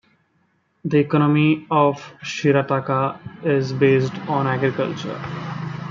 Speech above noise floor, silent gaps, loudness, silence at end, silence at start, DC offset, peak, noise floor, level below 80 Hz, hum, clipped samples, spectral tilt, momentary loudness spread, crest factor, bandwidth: 45 dB; none; -20 LUFS; 0 s; 0.85 s; under 0.1%; -4 dBFS; -65 dBFS; -62 dBFS; none; under 0.1%; -7.5 dB/octave; 12 LU; 18 dB; 7.4 kHz